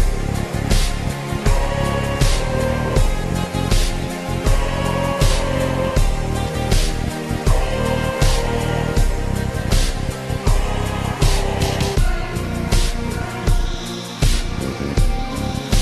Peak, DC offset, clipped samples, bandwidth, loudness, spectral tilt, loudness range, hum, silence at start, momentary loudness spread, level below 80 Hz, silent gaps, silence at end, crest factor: -2 dBFS; under 0.1%; under 0.1%; 13 kHz; -21 LUFS; -5 dB/octave; 1 LU; none; 0 s; 5 LU; -20 dBFS; none; 0 s; 16 dB